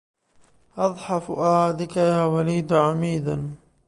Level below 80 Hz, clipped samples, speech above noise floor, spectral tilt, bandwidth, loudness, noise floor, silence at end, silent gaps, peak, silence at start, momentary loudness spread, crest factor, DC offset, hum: -56 dBFS; under 0.1%; 36 dB; -7 dB/octave; 11.5 kHz; -22 LUFS; -57 dBFS; 0.3 s; none; -6 dBFS; 0.75 s; 8 LU; 18 dB; under 0.1%; none